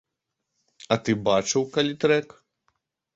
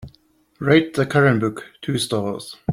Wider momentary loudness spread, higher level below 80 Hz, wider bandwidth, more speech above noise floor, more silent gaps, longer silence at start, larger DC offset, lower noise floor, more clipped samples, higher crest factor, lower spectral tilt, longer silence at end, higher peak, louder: second, 4 LU vs 12 LU; second, -62 dBFS vs -54 dBFS; second, 8 kHz vs 16 kHz; first, 59 dB vs 39 dB; neither; first, 0.9 s vs 0 s; neither; first, -82 dBFS vs -58 dBFS; neither; about the same, 20 dB vs 18 dB; second, -4 dB/octave vs -6 dB/octave; first, 0.9 s vs 0 s; second, -6 dBFS vs -2 dBFS; second, -24 LUFS vs -20 LUFS